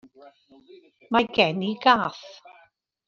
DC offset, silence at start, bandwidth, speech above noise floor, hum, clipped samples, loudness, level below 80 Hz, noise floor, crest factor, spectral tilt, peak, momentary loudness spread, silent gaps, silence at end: under 0.1%; 1.1 s; 7.2 kHz; 36 dB; none; under 0.1%; -22 LUFS; -64 dBFS; -61 dBFS; 22 dB; -5.5 dB/octave; -4 dBFS; 18 LU; none; 0.75 s